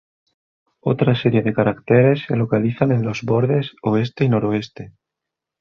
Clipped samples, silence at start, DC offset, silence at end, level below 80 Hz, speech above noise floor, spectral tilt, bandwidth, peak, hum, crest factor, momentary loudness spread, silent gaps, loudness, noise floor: under 0.1%; 0.85 s; under 0.1%; 0.7 s; -54 dBFS; 66 dB; -8.5 dB/octave; 6.8 kHz; -2 dBFS; none; 16 dB; 8 LU; none; -19 LUFS; -84 dBFS